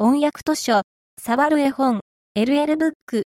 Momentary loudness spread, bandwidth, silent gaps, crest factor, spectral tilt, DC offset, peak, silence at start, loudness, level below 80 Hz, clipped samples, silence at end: 10 LU; 16.5 kHz; 0.84-1.17 s, 2.01-2.35 s, 2.95-3.07 s; 14 dB; -4.5 dB/octave; under 0.1%; -6 dBFS; 0 s; -20 LUFS; -62 dBFS; under 0.1%; 0.1 s